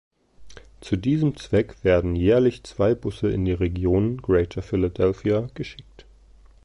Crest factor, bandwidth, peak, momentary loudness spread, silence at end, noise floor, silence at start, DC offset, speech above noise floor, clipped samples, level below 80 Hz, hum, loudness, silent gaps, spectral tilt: 16 dB; 11 kHz; -8 dBFS; 6 LU; 0.85 s; -51 dBFS; 0.4 s; under 0.1%; 29 dB; under 0.1%; -38 dBFS; none; -23 LUFS; none; -8 dB/octave